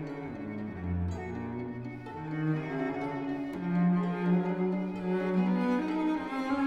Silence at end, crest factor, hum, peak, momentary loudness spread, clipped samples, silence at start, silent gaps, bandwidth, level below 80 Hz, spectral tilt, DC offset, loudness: 0 s; 14 dB; none; -16 dBFS; 10 LU; under 0.1%; 0 s; none; 7.8 kHz; -56 dBFS; -9 dB/octave; under 0.1%; -32 LUFS